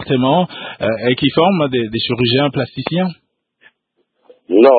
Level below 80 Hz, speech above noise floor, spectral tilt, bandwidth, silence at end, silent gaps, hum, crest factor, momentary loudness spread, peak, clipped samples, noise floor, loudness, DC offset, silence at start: -52 dBFS; 53 dB; -10 dB/octave; 4.8 kHz; 0 s; none; none; 16 dB; 8 LU; 0 dBFS; under 0.1%; -67 dBFS; -16 LUFS; under 0.1%; 0 s